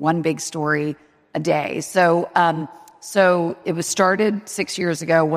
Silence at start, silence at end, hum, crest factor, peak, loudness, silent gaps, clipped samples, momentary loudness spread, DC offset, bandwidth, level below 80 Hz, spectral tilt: 0 s; 0 s; none; 18 dB; -2 dBFS; -20 LUFS; none; under 0.1%; 11 LU; under 0.1%; 15.5 kHz; -68 dBFS; -4.5 dB/octave